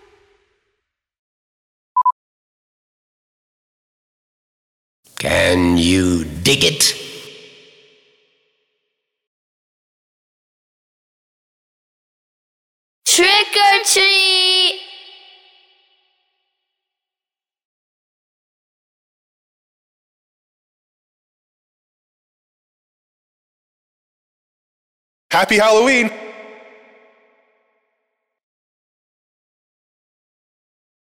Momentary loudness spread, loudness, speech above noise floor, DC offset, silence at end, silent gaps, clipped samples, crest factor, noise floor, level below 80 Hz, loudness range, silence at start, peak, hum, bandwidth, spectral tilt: 18 LU; -13 LUFS; over 76 dB; under 0.1%; 4.65 s; 2.12-5.03 s, 9.27-13.02 s, 17.65-25.30 s; under 0.1%; 20 dB; under -90 dBFS; -50 dBFS; 13 LU; 1.95 s; -2 dBFS; none; 16.5 kHz; -2.5 dB/octave